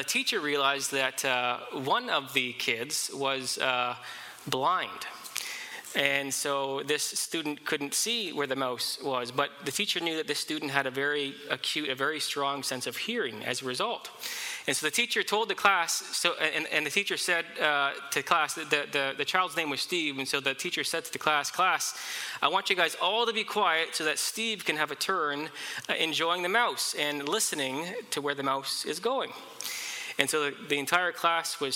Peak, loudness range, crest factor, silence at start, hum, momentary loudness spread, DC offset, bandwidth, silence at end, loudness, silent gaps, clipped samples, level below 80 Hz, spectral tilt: -8 dBFS; 3 LU; 24 dB; 0 s; none; 7 LU; under 0.1%; 17 kHz; 0 s; -29 LUFS; none; under 0.1%; -78 dBFS; -1.5 dB/octave